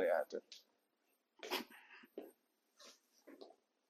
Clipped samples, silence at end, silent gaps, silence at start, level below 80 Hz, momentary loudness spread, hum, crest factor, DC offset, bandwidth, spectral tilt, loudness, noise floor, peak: under 0.1%; 0.4 s; none; 0 s; under -90 dBFS; 21 LU; none; 22 dB; under 0.1%; 15.5 kHz; -2 dB/octave; -45 LUFS; -83 dBFS; -26 dBFS